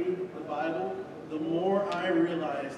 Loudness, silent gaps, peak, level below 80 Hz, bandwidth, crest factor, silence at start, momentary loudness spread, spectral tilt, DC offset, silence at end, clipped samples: -31 LUFS; none; -16 dBFS; -72 dBFS; 9.4 kHz; 14 dB; 0 s; 8 LU; -7 dB/octave; under 0.1%; 0 s; under 0.1%